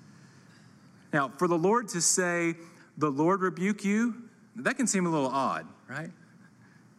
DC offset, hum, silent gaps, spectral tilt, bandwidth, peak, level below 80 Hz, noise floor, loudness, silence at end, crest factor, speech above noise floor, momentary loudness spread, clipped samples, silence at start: under 0.1%; none; none; -4 dB/octave; 14.5 kHz; -12 dBFS; -82 dBFS; -57 dBFS; -28 LUFS; 0.85 s; 18 dB; 29 dB; 16 LU; under 0.1%; 1.15 s